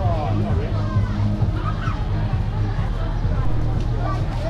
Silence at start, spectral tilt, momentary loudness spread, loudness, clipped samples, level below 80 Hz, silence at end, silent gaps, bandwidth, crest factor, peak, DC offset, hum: 0 s; -8.5 dB/octave; 3 LU; -23 LUFS; under 0.1%; -26 dBFS; 0 s; none; 7 kHz; 12 dB; -8 dBFS; under 0.1%; none